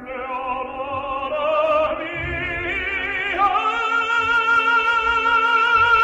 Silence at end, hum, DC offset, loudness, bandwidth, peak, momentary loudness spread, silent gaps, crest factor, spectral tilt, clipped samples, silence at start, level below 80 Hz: 0 s; none; under 0.1%; -19 LUFS; 8.4 kHz; -6 dBFS; 10 LU; none; 14 dB; -4 dB/octave; under 0.1%; 0 s; -44 dBFS